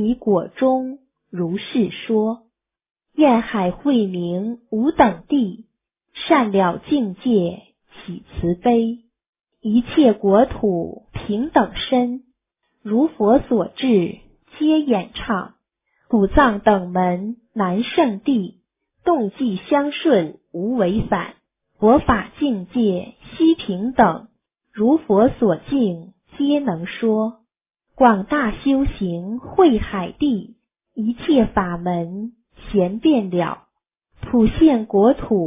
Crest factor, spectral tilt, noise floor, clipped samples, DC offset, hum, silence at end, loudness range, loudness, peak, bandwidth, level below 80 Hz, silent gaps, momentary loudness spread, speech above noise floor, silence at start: 18 dB; -11 dB/octave; -72 dBFS; under 0.1%; under 0.1%; none; 0 s; 2 LU; -19 LUFS; 0 dBFS; 3.8 kHz; -40 dBFS; 2.91-2.95 s, 9.29-9.33 s; 13 LU; 54 dB; 0 s